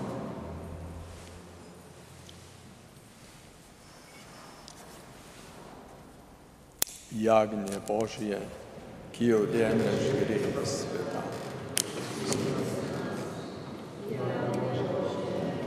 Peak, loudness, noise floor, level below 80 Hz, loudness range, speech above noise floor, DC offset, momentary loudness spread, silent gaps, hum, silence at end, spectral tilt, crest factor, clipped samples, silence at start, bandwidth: 0 dBFS; -31 LUFS; -53 dBFS; -58 dBFS; 20 LU; 25 dB; under 0.1%; 24 LU; none; none; 0 s; -5 dB/octave; 32 dB; under 0.1%; 0 s; 15.5 kHz